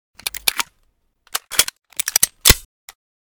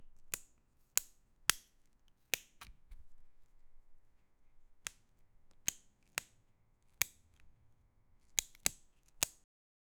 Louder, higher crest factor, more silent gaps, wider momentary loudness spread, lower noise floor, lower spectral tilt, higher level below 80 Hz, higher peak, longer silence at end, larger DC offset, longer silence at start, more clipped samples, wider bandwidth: first, -18 LUFS vs -39 LUFS; second, 22 dB vs 42 dB; neither; about the same, 14 LU vs 15 LU; second, -64 dBFS vs -70 dBFS; first, -0.5 dB/octave vs 1 dB/octave; first, -32 dBFS vs -64 dBFS; first, 0 dBFS vs -4 dBFS; first, 0.8 s vs 0.65 s; neither; first, 0.25 s vs 0 s; neither; about the same, over 20 kHz vs over 20 kHz